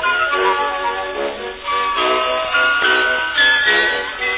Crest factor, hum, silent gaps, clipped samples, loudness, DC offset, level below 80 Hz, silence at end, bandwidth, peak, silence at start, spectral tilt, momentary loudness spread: 14 dB; none; none; under 0.1%; -16 LUFS; under 0.1%; -48 dBFS; 0 s; 4 kHz; -2 dBFS; 0 s; -5 dB/octave; 10 LU